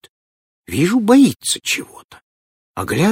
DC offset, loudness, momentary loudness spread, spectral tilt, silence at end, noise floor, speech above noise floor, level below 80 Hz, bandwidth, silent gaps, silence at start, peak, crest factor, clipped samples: under 0.1%; -16 LUFS; 17 LU; -4.5 dB/octave; 0 s; under -90 dBFS; over 74 dB; -54 dBFS; 16.5 kHz; 2.04-2.09 s, 2.22-2.74 s; 0.7 s; 0 dBFS; 18 dB; under 0.1%